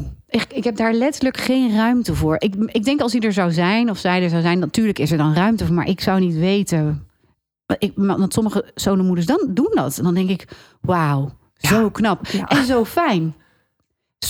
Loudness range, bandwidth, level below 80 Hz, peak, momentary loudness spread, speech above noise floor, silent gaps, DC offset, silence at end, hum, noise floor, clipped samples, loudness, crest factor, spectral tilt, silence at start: 2 LU; 17 kHz; -44 dBFS; -2 dBFS; 6 LU; 55 dB; none; under 0.1%; 0 s; none; -72 dBFS; under 0.1%; -19 LUFS; 16 dB; -6 dB/octave; 0 s